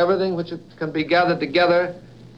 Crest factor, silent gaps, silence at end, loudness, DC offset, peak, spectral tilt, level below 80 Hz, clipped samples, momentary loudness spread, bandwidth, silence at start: 16 dB; none; 0.1 s; -20 LUFS; 0.2%; -4 dBFS; -7 dB/octave; -58 dBFS; under 0.1%; 13 LU; 7 kHz; 0 s